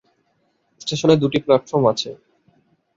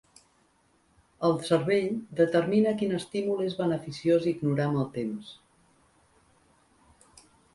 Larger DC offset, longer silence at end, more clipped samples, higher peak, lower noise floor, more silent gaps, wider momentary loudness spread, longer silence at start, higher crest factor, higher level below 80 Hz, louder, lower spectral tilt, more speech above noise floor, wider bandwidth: neither; second, 0.8 s vs 2.2 s; neither; first, -2 dBFS vs -10 dBFS; about the same, -66 dBFS vs -67 dBFS; neither; first, 12 LU vs 7 LU; second, 0.85 s vs 1.2 s; about the same, 18 dB vs 20 dB; first, -58 dBFS vs -66 dBFS; first, -19 LUFS vs -27 LUFS; about the same, -6 dB/octave vs -7 dB/octave; first, 49 dB vs 40 dB; second, 7.8 kHz vs 11.5 kHz